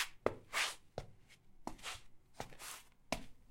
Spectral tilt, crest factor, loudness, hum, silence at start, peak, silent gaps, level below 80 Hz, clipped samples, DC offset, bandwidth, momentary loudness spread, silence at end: -2 dB/octave; 30 dB; -44 LUFS; none; 0 s; -14 dBFS; none; -62 dBFS; under 0.1%; under 0.1%; 16.5 kHz; 15 LU; 0 s